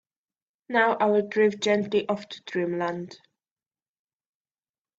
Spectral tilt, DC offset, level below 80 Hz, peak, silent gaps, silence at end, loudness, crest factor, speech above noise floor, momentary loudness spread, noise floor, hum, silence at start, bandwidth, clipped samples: -5 dB/octave; under 0.1%; -74 dBFS; -6 dBFS; none; 1.85 s; -25 LUFS; 20 dB; over 65 dB; 11 LU; under -90 dBFS; none; 0.7 s; 7.8 kHz; under 0.1%